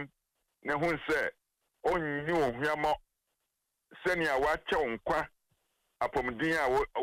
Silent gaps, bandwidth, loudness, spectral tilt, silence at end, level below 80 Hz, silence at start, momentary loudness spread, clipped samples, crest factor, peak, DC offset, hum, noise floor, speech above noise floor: none; 16 kHz; -32 LUFS; -5 dB/octave; 0 s; -56 dBFS; 0 s; 8 LU; under 0.1%; 14 dB; -20 dBFS; under 0.1%; none; -84 dBFS; 53 dB